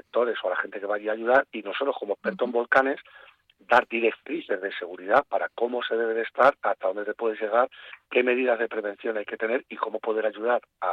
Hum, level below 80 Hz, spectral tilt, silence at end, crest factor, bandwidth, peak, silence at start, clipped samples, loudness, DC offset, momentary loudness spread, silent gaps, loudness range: none; -70 dBFS; -5.5 dB/octave; 0 s; 20 dB; 7.6 kHz; -6 dBFS; 0.15 s; under 0.1%; -26 LUFS; under 0.1%; 9 LU; none; 2 LU